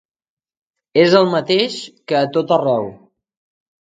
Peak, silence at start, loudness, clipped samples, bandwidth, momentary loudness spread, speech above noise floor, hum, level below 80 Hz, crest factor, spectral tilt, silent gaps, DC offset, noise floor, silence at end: 0 dBFS; 0.95 s; -16 LUFS; under 0.1%; 9.2 kHz; 10 LU; over 75 dB; none; -64 dBFS; 18 dB; -5.5 dB/octave; none; under 0.1%; under -90 dBFS; 0.95 s